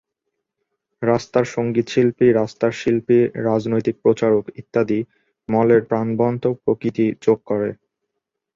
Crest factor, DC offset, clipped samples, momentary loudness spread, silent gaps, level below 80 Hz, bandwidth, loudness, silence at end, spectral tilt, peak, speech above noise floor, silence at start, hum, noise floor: 16 dB; under 0.1%; under 0.1%; 7 LU; none; -58 dBFS; 7.6 kHz; -19 LUFS; 0.8 s; -7.5 dB/octave; -2 dBFS; 61 dB; 1 s; none; -79 dBFS